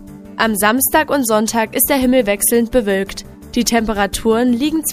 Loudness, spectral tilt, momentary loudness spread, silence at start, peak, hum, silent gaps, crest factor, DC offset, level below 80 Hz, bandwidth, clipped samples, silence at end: -15 LUFS; -3 dB/octave; 6 LU; 0 s; 0 dBFS; none; none; 16 dB; under 0.1%; -38 dBFS; 15.5 kHz; under 0.1%; 0 s